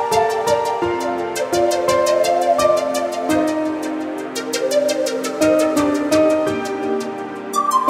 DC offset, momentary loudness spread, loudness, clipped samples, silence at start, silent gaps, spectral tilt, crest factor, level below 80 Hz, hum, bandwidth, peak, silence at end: under 0.1%; 8 LU; -18 LUFS; under 0.1%; 0 s; none; -3.5 dB/octave; 16 dB; -54 dBFS; none; 16 kHz; -2 dBFS; 0 s